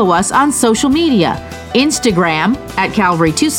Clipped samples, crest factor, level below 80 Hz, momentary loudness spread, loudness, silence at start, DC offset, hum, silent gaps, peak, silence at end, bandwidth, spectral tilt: under 0.1%; 12 dB; -38 dBFS; 5 LU; -13 LUFS; 0 s; under 0.1%; none; none; 0 dBFS; 0 s; 17.5 kHz; -4 dB/octave